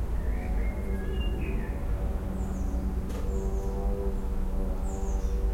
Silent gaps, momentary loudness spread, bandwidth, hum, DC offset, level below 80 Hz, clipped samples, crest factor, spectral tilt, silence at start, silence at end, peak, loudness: none; 2 LU; 15.5 kHz; none; under 0.1%; -30 dBFS; under 0.1%; 12 dB; -7.5 dB/octave; 0 s; 0 s; -18 dBFS; -33 LUFS